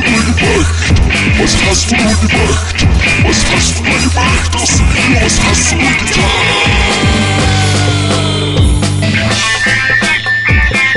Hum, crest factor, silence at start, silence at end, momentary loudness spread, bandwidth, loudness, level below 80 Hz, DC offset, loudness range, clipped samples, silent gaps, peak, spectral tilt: none; 10 dB; 0 s; 0 s; 2 LU; 11.5 kHz; -9 LUFS; -16 dBFS; 1%; 1 LU; under 0.1%; none; 0 dBFS; -3.5 dB/octave